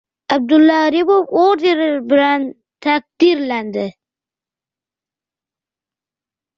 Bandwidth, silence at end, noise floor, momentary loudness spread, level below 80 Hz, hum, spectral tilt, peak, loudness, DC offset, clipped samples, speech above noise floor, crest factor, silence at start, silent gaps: 6.8 kHz; 2.65 s; -89 dBFS; 12 LU; -64 dBFS; none; -5.5 dB/octave; -2 dBFS; -15 LUFS; under 0.1%; under 0.1%; 75 dB; 14 dB; 0.3 s; none